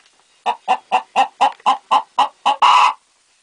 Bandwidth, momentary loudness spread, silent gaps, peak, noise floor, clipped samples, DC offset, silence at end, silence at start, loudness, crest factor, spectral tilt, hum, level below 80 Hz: 10 kHz; 12 LU; none; 0 dBFS; -45 dBFS; under 0.1%; under 0.1%; 0.5 s; 0.45 s; -16 LUFS; 16 dB; 0 dB/octave; none; -76 dBFS